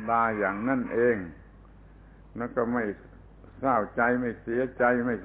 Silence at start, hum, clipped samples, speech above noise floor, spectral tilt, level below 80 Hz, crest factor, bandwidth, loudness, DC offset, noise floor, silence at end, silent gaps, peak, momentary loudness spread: 0 s; none; under 0.1%; 24 dB; -11 dB/octave; -54 dBFS; 18 dB; 4 kHz; -27 LUFS; under 0.1%; -51 dBFS; 0 s; none; -10 dBFS; 10 LU